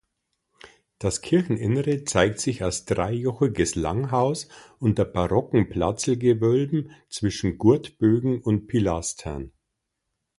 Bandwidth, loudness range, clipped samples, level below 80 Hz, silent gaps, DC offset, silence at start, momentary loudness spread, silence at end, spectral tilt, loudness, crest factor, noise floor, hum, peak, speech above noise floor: 11.5 kHz; 2 LU; under 0.1%; -44 dBFS; none; under 0.1%; 0.65 s; 8 LU; 0.9 s; -6 dB/octave; -24 LUFS; 20 dB; -80 dBFS; none; -4 dBFS; 57 dB